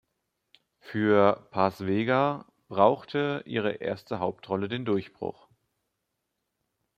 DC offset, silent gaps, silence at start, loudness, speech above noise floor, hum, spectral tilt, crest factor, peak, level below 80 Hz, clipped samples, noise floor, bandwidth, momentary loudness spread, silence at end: under 0.1%; none; 0.85 s; -27 LUFS; 55 dB; none; -8 dB/octave; 22 dB; -6 dBFS; -70 dBFS; under 0.1%; -81 dBFS; 13.5 kHz; 13 LU; 1.65 s